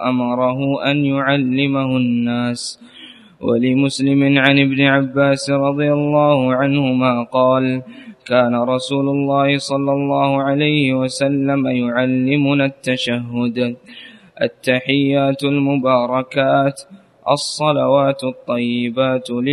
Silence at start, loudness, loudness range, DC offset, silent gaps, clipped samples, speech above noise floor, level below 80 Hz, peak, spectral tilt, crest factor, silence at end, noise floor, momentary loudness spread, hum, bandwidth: 0 s; -16 LUFS; 4 LU; under 0.1%; none; under 0.1%; 25 dB; -60 dBFS; 0 dBFS; -6 dB/octave; 16 dB; 0 s; -41 dBFS; 7 LU; none; 11.5 kHz